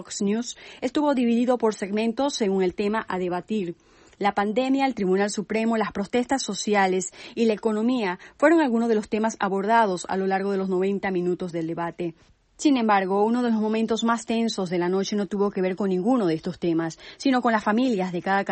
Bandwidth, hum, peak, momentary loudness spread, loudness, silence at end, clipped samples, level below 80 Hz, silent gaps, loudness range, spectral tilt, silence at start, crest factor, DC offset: 8.8 kHz; none; -6 dBFS; 7 LU; -24 LUFS; 0 s; under 0.1%; -62 dBFS; none; 2 LU; -5 dB/octave; 0 s; 18 dB; under 0.1%